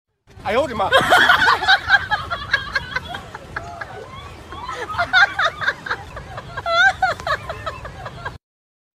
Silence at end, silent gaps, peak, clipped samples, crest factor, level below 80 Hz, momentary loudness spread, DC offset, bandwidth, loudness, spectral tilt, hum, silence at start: 0.6 s; none; 0 dBFS; under 0.1%; 20 dB; -44 dBFS; 20 LU; under 0.1%; 15.5 kHz; -17 LUFS; -3 dB/octave; none; 0.35 s